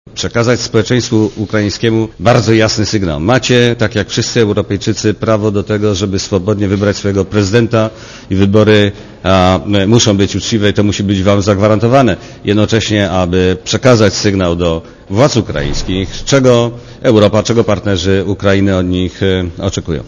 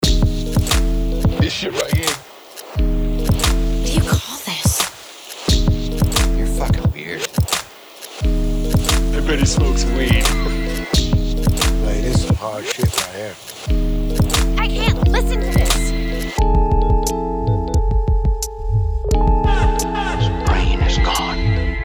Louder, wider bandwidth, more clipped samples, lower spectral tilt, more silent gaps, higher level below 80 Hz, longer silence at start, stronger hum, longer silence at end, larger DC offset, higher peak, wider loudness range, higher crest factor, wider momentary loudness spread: first, -12 LUFS vs -19 LUFS; second, 7.4 kHz vs over 20 kHz; first, 0.4% vs under 0.1%; about the same, -5.5 dB/octave vs -4.5 dB/octave; neither; second, -32 dBFS vs -20 dBFS; first, 0.15 s vs 0 s; neither; about the same, 0 s vs 0 s; neither; about the same, 0 dBFS vs 0 dBFS; about the same, 2 LU vs 2 LU; about the same, 12 dB vs 16 dB; about the same, 7 LU vs 6 LU